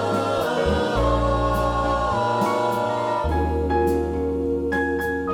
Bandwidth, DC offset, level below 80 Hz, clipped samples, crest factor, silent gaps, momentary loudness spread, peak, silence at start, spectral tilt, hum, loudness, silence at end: 18 kHz; under 0.1%; -32 dBFS; under 0.1%; 14 dB; none; 2 LU; -8 dBFS; 0 s; -6.5 dB/octave; none; -22 LUFS; 0 s